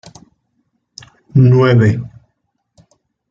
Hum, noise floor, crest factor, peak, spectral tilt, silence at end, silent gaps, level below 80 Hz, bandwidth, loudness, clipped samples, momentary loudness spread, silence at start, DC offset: none; -68 dBFS; 16 dB; 0 dBFS; -8.5 dB/octave; 1.25 s; none; -50 dBFS; 7.4 kHz; -12 LUFS; under 0.1%; 14 LU; 1.35 s; under 0.1%